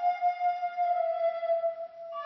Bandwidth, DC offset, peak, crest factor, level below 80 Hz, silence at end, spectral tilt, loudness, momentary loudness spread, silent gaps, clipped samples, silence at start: 6 kHz; under 0.1%; -18 dBFS; 10 dB; under -90 dBFS; 0 s; 2 dB/octave; -30 LUFS; 7 LU; none; under 0.1%; 0 s